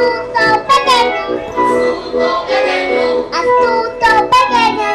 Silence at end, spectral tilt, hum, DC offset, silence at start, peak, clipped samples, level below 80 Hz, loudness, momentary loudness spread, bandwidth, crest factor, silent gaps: 0 s; -3 dB/octave; none; under 0.1%; 0 s; -2 dBFS; under 0.1%; -42 dBFS; -12 LUFS; 6 LU; 13.5 kHz; 10 dB; none